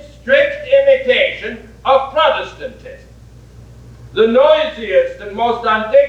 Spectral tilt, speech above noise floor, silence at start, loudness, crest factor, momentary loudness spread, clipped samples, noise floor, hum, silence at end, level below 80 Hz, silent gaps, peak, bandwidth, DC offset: -5 dB/octave; 25 dB; 0.05 s; -14 LUFS; 14 dB; 14 LU; under 0.1%; -39 dBFS; none; 0 s; -44 dBFS; none; 0 dBFS; 7.2 kHz; under 0.1%